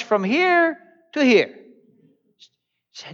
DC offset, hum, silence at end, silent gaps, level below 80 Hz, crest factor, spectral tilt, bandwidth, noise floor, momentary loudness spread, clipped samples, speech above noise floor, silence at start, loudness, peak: under 0.1%; none; 0 s; none; -84 dBFS; 16 dB; -5 dB/octave; 7.4 kHz; -65 dBFS; 18 LU; under 0.1%; 47 dB; 0 s; -19 LUFS; -6 dBFS